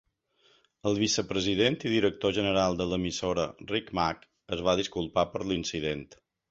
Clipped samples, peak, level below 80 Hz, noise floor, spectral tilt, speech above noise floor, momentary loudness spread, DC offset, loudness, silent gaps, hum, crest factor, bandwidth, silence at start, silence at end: under 0.1%; -10 dBFS; -52 dBFS; -67 dBFS; -4.5 dB/octave; 39 dB; 7 LU; under 0.1%; -29 LUFS; none; none; 20 dB; 8.2 kHz; 0.85 s; 0.35 s